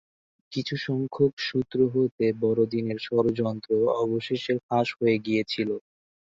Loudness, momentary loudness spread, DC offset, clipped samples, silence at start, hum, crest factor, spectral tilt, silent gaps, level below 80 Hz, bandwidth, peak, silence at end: -26 LUFS; 6 LU; under 0.1%; under 0.1%; 0.5 s; none; 16 dB; -7 dB/octave; 1.33-1.37 s, 2.12-2.18 s, 4.63-4.69 s; -64 dBFS; 7.6 kHz; -10 dBFS; 0.5 s